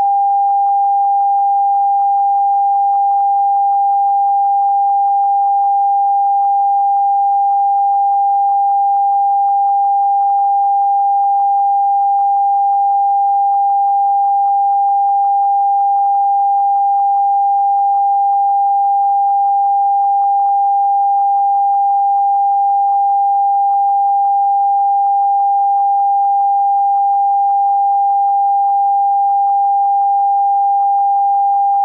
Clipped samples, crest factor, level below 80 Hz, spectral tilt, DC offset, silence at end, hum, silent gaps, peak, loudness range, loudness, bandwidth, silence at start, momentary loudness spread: under 0.1%; 4 dB; -86 dBFS; -4 dB/octave; under 0.1%; 0 s; none; none; -8 dBFS; 0 LU; -13 LUFS; 1.4 kHz; 0 s; 0 LU